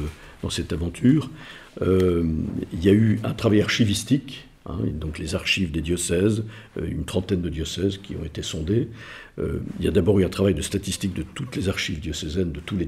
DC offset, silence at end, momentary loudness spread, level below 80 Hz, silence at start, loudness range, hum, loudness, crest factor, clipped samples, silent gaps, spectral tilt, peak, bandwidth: under 0.1%; 0 s; 13 LU; -42 dBFS; 0 s; 4 LU; none; -24 LUFS; 18 dB; under 0.1%; none; -5.5 dB/octave; -6 dBFS; 15.5 kHz